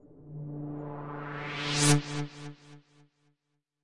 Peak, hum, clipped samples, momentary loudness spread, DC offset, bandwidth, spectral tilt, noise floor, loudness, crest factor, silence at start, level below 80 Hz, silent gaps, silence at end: -10 dBFS; none; under 0.1%; 21 LU; under 0.1%; 11.5 kHz; -4 dB/octave; -81 dBFS; -31 LUFS; 22 dB; 0 s; -62 dBFS; none; 0 s